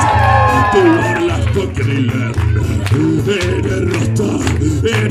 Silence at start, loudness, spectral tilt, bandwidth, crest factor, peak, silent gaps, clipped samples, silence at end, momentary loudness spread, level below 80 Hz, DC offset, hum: 0 s; -14 LUFS; -6.5 dB/octave; 13.5 kHz; 12 dB; 0 dBFS; none; under 0.1%; 0 s; 6 LU; -28 dBFS; under 0.1%; none